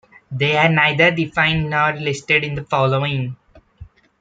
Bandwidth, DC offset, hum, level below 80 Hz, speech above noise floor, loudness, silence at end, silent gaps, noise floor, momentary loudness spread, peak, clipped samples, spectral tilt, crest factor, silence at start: 9 kHz; under 0.1%; none; -48 dBFS; 25 dB; -17 LUFS; 0.35 s; none; -43 dBFS; 10 LU; -2 dBFS; under 0.1%; -5.5 dB/octave; 18 dB; 0.3 s